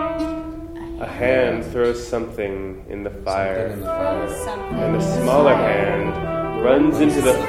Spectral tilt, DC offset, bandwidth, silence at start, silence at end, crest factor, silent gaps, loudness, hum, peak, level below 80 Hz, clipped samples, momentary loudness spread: -6 dB/octave; under 0.1%; 15.5 kHz; 0 s; 0 s; 18 dB; none; -20 LUFS; none; -2 dBFS; -38 dBFS; under 0.1%; 15 LU